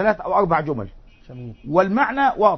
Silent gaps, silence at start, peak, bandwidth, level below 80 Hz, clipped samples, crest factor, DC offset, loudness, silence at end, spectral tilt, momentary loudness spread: none; 0 s; -2 dBFS; 6.2 kHz; -46 dBFS; under 0.1%; 18 dB; under 0.1%; -20 LUFS; 0 s; -8 dB/octave; 20 LU